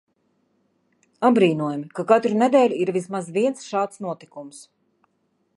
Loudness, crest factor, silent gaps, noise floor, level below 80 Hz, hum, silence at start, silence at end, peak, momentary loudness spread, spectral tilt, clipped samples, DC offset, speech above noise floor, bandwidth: -21 LUFS; 20 dB; none; -69 dBFS; -76 dBFS; none; 1.2 s; 0.95 s; -2 dBFS; 16 LU; -6 dB/octave; under 0.1%; under 0.1%; 48 dB; 11.5 kHz